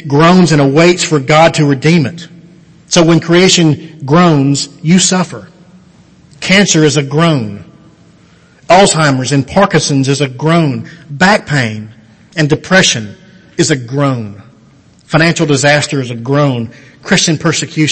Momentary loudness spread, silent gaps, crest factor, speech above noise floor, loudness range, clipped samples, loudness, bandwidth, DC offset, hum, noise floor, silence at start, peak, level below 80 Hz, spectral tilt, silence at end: 14 LU; none; 10 dB; 34 dB; 4 LU; 0.3%; -10 LUFS; 11 kHz; under 0.1%; none; -43 dBFS; 0.05 s; 0 dBFS; -44 dBFS; -4.5 dB/octave; 0 s